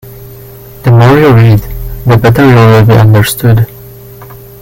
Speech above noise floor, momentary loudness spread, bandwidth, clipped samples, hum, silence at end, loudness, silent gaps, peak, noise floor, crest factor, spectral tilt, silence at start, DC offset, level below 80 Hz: 25 dB; 11 LU; 17 kHz; 3%; none; 0.25 s; -6 LUFS; none; 0 dBFS; -29 dBFS; 6 dB; -7 dB/octave; 0.05 s; under 0.1%; -28 dBFS